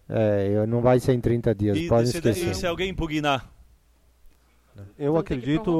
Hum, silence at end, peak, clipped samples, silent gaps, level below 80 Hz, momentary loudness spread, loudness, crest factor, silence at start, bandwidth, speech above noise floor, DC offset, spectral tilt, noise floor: none; 0 s; -8 dBFS; under 0.1%; none; -44 dBFS; 6 LU; -24 LUFS; 16 dB; 0.1 s; 15 kHz; 37 dB; under 0.1%; -6.5 dB/octave; -59 dBFS